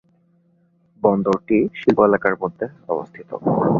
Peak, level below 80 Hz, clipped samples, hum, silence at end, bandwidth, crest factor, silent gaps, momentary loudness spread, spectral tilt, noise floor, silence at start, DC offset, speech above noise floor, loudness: -2 dBFS; -56 dBFS; under 0.1%; none; 0 s; 7.2 kHz; 18 dB; none; 11 LU; -9 dB/octave; -60 dBFS; 1.05 s; under 0.1%; 41 dB; -20 LUFS